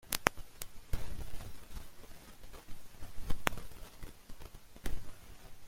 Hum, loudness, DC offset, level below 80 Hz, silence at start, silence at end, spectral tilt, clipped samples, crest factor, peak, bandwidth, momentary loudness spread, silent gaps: none; -42 LUFS; under 0.1%; -46 dBFS; 0.05 s; 0 s; -3 dB/octave; under 0.1%; 34 dB; -2 dBFS; 16.5 kHz; 19 LU; none